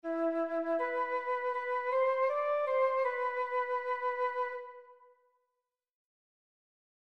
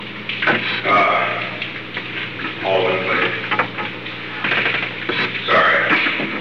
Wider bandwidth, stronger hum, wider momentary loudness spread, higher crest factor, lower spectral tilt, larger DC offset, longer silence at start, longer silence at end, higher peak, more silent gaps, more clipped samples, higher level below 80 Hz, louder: second, 6 kHz vs 7.4 kHz; second, none vs 60 Hz at -50 dBFS; second, 4 LU vs 11 LU; about the same, 16 dB vs 16 dB; second, -4 dB/octave vs -5.5 dB/octave; second, under 0.1% vs 0.6%; about the same, 0.05 s vs 0 s; first, 2.25 s vs 0 s; second, -20 dBFS vs -4 dBFS; neither; neither; second, -88 dBFS vs -64 dBFS; second, -33 LUFS vs -18 LUFS